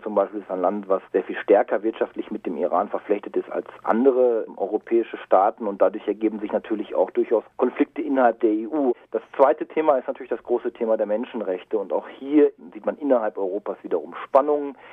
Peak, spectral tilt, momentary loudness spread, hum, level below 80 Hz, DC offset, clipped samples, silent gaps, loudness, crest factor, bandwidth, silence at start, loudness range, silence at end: -4 dBFS; -8.5 dB/octave; 9 LU; none; -72 dBFS; under 0.1%; under 0.1%; none; -23 LUFS; 20 dB; 3.9 kHz; 0 s; 2 LU; 0 s